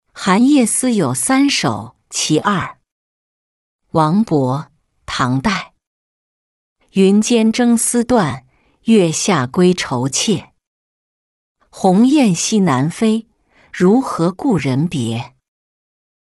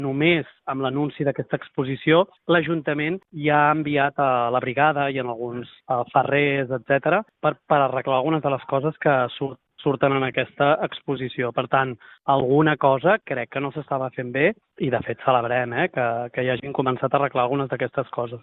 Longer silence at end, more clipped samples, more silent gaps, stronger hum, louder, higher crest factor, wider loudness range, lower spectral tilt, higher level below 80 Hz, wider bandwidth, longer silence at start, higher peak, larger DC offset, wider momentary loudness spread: first, 1.1 s vs 0.05 s; neither; first, 2.92-3.79 s, 5.87-6.76 s, 10.67-11.55 s vs none; neither; first, -15 LUFS vs -22 LUFS; second, 14 dB vs 20 dB; first, 5 LU vs 2 LU; about the same, -5 dB/octave vs -4.5 dB/octave; first, -50 dBFS vs -62 dBFS; first, 12 kHz vs 4.1 kHz; first, 0.15 s vs 0 s; about the same, -2 dBFS vs -2 dBFS; neither; about the same, 11 LU vs 9 LU